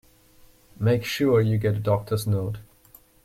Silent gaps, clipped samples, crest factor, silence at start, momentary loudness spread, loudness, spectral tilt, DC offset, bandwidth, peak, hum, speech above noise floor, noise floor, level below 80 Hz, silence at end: none; under 0.1%; 16 dB; 0.8 s; 7 LU; -24 LUFS; -7 dB/octave; under 0.1%; 16 kHz; -10 dBFS; none; 32 dB; -55 dBFS; -52 dBFS; 0.6 s